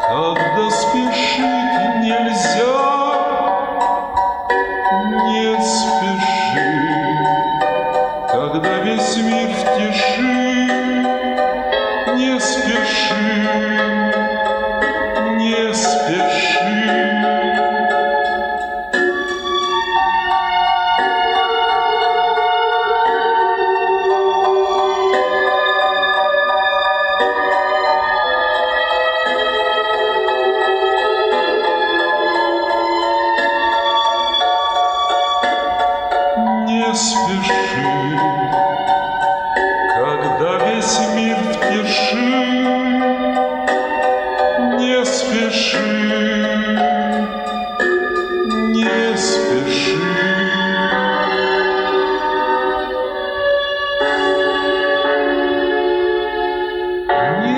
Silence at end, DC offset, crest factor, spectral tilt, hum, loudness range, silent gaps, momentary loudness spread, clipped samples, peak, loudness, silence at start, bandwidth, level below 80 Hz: 0 s; under 0.1%; 12 dB; -3.5 dB/octave; none; 2 LU; none; 3 LU; under 0.1%; -4 dBFS; -16 LUFS; 0 s; 11 kHz; -48 dBFS